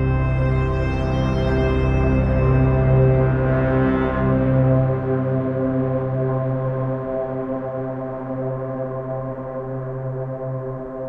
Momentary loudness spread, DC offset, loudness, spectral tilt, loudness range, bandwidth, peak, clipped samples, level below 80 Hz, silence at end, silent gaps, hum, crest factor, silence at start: 10 LU; under 0.1%; -21 LUFS; -10 dB/octave; 9 LU; 5.6 kHz; -6 dBFS; under 0.1%; -28 dBFS; 0 s; none; none; 14 dB; 0 s